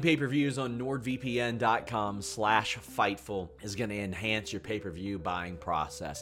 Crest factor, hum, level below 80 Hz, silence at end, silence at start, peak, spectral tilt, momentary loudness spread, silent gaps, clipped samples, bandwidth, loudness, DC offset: 22 dB; none; -56 dBFS; 0 s; 0 s; -10 dBFS; -5 dB/octave; 9 LU; none; under 0.1%; 16.5 kHz; -32 LUFS; under 0.1%